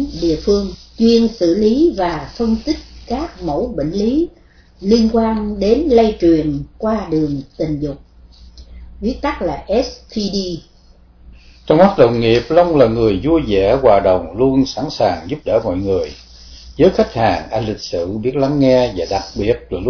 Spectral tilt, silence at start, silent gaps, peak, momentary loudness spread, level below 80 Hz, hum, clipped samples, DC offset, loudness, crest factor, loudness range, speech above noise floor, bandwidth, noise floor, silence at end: -6.5 dB/octave; 0 s; none; 0 dBFS; 11 LU; -34 dBFS; none; under 0.1%; under 0.1%; -16 LUFS; 16 dB; 8 LU; 31 dB; 5.4 kHz; -46 dBFS; 0 s